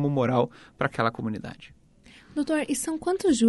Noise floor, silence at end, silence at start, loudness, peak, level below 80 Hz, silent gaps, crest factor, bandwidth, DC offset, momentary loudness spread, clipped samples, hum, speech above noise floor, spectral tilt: -54 dBFS; 0 s; 0 s; -27 LUFS; -8 dBFS; -58 dBFS; none; 18 dB; 11.5 kHz; under 0.1%; 12 LU; under 0.1%; none; 28 dB; -5.5 dB/octave